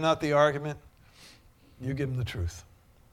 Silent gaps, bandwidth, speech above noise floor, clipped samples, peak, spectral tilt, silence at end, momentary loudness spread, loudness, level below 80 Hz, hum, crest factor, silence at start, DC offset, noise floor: none; 15.5 kHz; 29 dB; under 0.1%; -8 dBFS; -6 dB/octave; 0.5 s; 17 LU; -29 LUFS; -50 dBFS; none; 22 dB; 0 s; under 0.1%; -57 dBFS